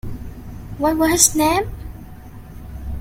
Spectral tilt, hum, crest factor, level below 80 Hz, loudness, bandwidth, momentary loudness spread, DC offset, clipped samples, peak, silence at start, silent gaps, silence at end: -3 dB/octave; none; 20 dB; -34 dBFS; -16 LUFS; 16.5 kHz; 25 LU; under 0.1%; under 0.1%; 0 dBFS; 0.05 s; none; 0 s